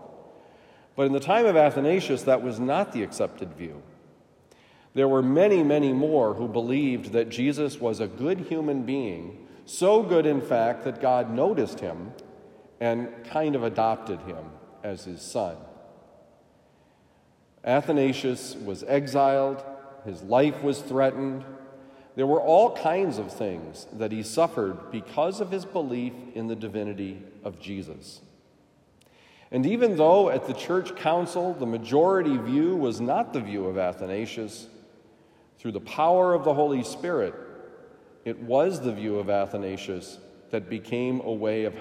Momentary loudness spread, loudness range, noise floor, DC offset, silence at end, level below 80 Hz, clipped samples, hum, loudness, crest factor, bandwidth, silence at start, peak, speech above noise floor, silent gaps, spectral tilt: 17 LU; 7 LU; -61 dBFS; under 0.1%; 0 s; -70 dBFS; under 0.1%; none; -25 LUFS; 20 dB; 15.5 kHz; 0 s; -6 dBFS; 36 dB; none; -6 dB/octave